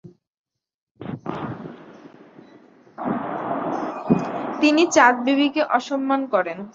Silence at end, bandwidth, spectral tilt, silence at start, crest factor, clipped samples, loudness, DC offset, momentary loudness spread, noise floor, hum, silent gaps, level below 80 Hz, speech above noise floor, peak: 0.05 s; 8 kHz; -4.5 dB/octave; 0.05 s; 22 dB; under 0.1%; -21 LUFS; under 0.1%; 17 LU; -50 dBFS; none; 0.27-0.44 s, 0.74-0.95 s; -64 dBFS; 31 dB; -2 dBFS